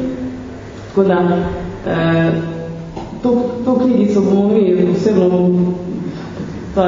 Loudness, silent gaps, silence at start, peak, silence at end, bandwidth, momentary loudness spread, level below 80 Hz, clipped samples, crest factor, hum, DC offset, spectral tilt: -15 LUFS; none; 0 s; 0 dBFS; 0 s; 7.6 kHz; 14 LU; -40 dBFS; under 0.1%; 16 dB; none; under 0.1%; -8.5 dB/octave